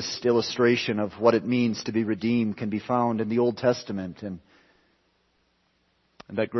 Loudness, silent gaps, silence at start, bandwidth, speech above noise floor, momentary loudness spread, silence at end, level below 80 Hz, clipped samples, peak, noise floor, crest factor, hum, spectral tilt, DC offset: -25 LUFS; none; 0 s; 6.2 kHz; 44 dB; 12 LU; 0 s; -66 dBFS; under 0.1%; -6 dBFS; -69 dBFS; 20 dB; none; -6 dB/octave; under 0.1%